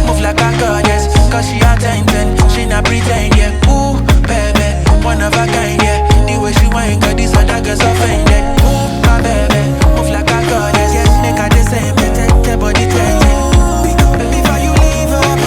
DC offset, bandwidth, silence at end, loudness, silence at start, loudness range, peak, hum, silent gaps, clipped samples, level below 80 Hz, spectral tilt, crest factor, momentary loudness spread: under 0.1%; 17 kHz; 0 s; -11 LUFS; 0 s; 0 LU; 0 dBFS; none; none; under 0.1%; -14 dBFS; -5 dB/octave; 10 dB; 2 LU